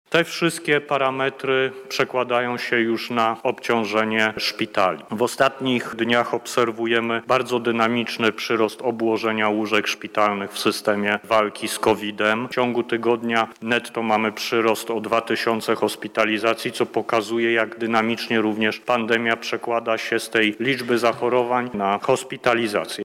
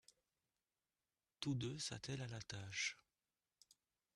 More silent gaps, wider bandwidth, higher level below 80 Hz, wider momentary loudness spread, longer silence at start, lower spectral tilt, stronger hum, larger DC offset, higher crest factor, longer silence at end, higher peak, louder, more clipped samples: neither; first, 16.5 kHz vs 12 kHz; first, -66 dBFS vs -76 dBFS; second, 3 LU vs 6 LU; second, 0.1 s vs 1.4 s; about the same, -4 dB/octave vs -3.5 dB/octave; neither; neither; second, 14 dB vs 22 dB; second, 0 s vs 1.15 s; first, -6 dBFS vs -28 dBFS; first, -21 LUFS vs -46 LUFS; neither